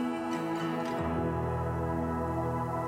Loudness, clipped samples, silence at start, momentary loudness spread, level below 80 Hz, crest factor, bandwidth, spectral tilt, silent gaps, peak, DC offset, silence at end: -32 LUFS; under 0.1%; 0 s; 1 LU; -46 dBFS; 12 dB; 16 kHz; -7.5 dB/octave; none; -20 dBFS; under 0.1%; 0 s